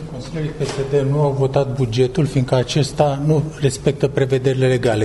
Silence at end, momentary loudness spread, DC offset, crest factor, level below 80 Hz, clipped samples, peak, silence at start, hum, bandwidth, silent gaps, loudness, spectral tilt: 0 s; 7 LU; under 0.1%; 16 dB; -40 dBFS; under 0.1%; -2 dBFS; 0 s; none; 11.5 kHz; none; -18 LUFS; -6.5 dB/octave